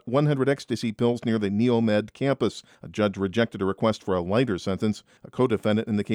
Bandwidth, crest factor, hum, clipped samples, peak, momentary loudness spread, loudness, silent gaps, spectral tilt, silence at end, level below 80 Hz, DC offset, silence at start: 11.5 kHz; 16 dB; none; under 0.1%; -8 dBFS; 6 LU; -25 LUFS; none; -7 dB/octave; 0 s; -60 dBFS; under 0.1%; 0.05 s